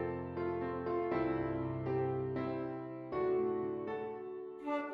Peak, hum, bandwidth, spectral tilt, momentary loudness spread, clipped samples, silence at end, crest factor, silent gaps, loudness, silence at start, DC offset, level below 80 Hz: -24 dBFS; none; 5.4 kHz; -10 dB/octave; 8 LU; under 0.1%; 0 s; 14 dB; none; -38 LUFS; 0 s; under 0.1%; -64 dBFS